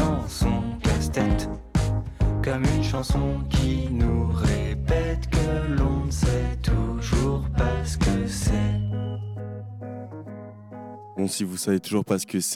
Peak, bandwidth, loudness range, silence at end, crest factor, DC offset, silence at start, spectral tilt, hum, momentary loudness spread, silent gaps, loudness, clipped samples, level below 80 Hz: -10 dBFS; 16 kHz; 5 LU; 0 s; 14 dB; under 0.1%; 0 s; -6 dB/octave; none; 13 LU; none; -25 LUFS; under 0.1%; -30 dBFS